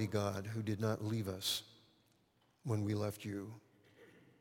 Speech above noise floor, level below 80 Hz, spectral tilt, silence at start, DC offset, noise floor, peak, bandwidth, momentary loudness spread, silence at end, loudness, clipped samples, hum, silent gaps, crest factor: 36 dB; -76 dBFS; -5.5 dB/octave; 0 s; under 0.1%; -74 dBFS; -22 dBFS; 16.5 kHz; 13 LU; 0.2 s; -40 LUFS; under 0.1%; none; none; 18 dB